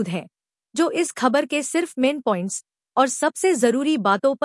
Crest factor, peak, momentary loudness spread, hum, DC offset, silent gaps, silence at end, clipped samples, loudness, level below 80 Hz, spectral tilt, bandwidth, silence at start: 16 dB; -6 dBFS; 9 LU; none; under 0.1%; none; 0 s; under 0.1%; -21 LUFS; -78 dBFS; -4 dB/octave; 12 kHz; 0 s